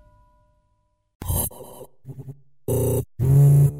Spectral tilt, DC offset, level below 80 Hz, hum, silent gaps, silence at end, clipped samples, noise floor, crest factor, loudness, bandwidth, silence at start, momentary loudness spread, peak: -7.5 dB/octave; under 0.1%; -40 dBFS; none; none; 0 s; under 0.1%; -68 dBFS; 12 dB; -21 LUFS; 16 kHz; 1.2 s; 26 LU; -10 dBFS